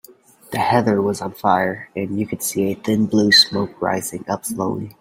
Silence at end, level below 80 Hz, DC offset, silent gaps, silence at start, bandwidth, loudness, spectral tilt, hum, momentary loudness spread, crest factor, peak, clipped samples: 0.1 s; -56 dBFS; under 0.1%; none; 0.5 s; 16.5 kHz; -19 LUFS; -4 dB/octave; none; 13 LU; 20 dB; 0 dBFS; under 0.1%